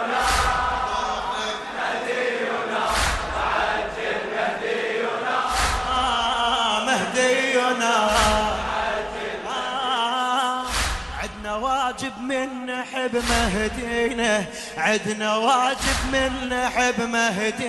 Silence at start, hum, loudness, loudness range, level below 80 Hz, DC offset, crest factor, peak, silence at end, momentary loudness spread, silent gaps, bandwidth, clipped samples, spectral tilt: 0 s; none; -23 LUFS; 4 LU; -38 dBFS; under 0.1%; 18 dB; -6 dBFS; 0 s; 7 LU; none; 12 kHz; under 0.1%; -3 dB/octave